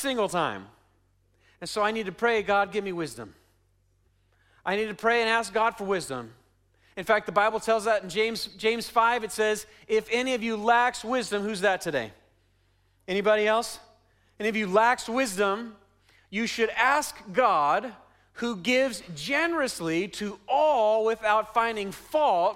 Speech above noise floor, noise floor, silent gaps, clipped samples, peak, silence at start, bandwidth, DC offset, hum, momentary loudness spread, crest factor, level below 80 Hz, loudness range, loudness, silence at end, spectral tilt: 41 dB; -67 dBFS; none; under 0.1%; -8 dBFS; 0 s; 16 kHz; under 0.1%; none; 12 LU; 20 dB; -62 dBFS; 3 LU; -26 LUFS; 0 s; -3.5 dB/octave